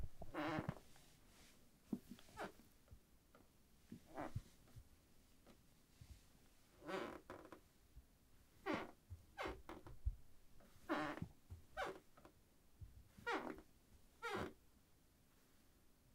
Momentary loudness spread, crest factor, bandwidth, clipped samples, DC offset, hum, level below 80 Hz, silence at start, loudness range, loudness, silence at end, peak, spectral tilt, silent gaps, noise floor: 22 LU; 24 dB; 16 kHz; under 0.1%; under 0.1%; none; -64 dBFS; 0 s; 9 LU; -51 LUFS; 0 s; -30 dBFS; -5.5 dB/octave; none; -73 dBFS